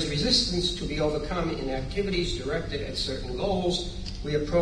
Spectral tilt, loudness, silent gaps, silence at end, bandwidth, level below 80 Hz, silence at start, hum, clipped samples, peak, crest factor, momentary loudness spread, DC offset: -4.5 dB/octave; -28 LUFS; none; 0 s; 10.5 kHz; -38 dBFS; 0 s; none; under 0.1%; -8 dBFS; 18 dB; 9 LU; under 0.1%